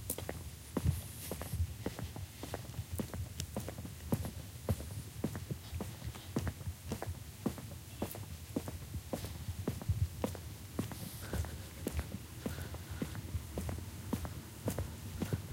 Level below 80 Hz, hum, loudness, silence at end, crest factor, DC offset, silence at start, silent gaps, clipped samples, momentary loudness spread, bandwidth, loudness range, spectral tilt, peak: -50 dBFS; none; -42 LUFS; 0 s; 24 dB; under 0.1%; 0 s; none; under 0.1%; 7 LU; 17 kHz; 2 LU; -5.5 dB/octave; -18 dBFS